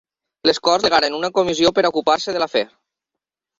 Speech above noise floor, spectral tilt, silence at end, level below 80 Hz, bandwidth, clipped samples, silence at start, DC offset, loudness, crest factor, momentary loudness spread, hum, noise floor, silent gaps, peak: 67 dB; -3 dB/octave; 0.95 s; -56 dBFS; 7.8 kHz; under 0.1%; 0.45 s; under 0.1%; -18 LUFS; 18 dB; 5 LU; none; -84 dBFS; none; -2 dBFS